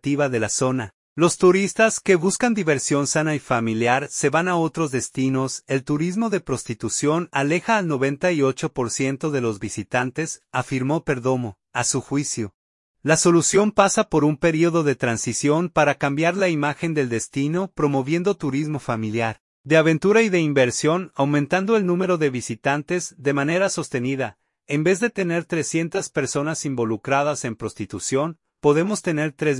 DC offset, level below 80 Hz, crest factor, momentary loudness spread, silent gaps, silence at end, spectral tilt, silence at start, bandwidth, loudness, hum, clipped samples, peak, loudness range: under 0.1%; -56 dBFS; 20 dB; 8 LU; 0.94-1.16 s, 12.54-12.94 s, 19.40-19.64 s; 0 s; -5 dB/octave; 0.05 s; 11.5 kHz; -21 LUFS; none; under 0.1%; -2 dBFS; 4 LU